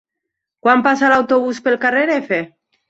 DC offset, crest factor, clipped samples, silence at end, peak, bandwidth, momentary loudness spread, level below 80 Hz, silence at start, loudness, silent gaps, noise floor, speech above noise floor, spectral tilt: under 0.1%; 16 dB; under 0.1%; 0.4 s; -2 dBFS; 8 kHz; 8 LU; -60 dBFS; 0.65 s; -15 LUFS; none; -80 dBFS; 65 dB; -5 dB/octave